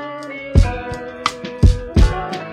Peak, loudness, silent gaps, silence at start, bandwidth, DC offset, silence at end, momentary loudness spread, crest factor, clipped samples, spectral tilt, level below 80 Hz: 0 dBFS; -19 LUFS; none; 0 s; 11 kHz; under 0.1%; 0 s; 12 LU; 16 dB; under 0.1%; -6.5 dB/octave; -20 dBFS